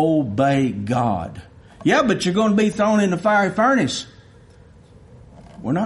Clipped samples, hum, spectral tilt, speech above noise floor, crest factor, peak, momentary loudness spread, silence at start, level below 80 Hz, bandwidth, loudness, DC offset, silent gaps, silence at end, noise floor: under 0.1%; none; -6 dB/octave; 29 dB; 14 dB; -6 dBFS; 10 LU; 0 s; -52 dBFS; 11.5 kHz; -19 LUFS; under 0.1%; none; 0 s; -47 dBFS